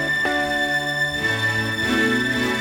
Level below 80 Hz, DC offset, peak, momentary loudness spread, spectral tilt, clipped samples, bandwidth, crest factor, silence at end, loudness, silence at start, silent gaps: -48 dBFS; under 0.1%; -8 dBFS; 2 LU; -4 dB/octave; under 0.1%; over 20 kHz; 14 dB; 0 s; -20 LUFS; 0 s; none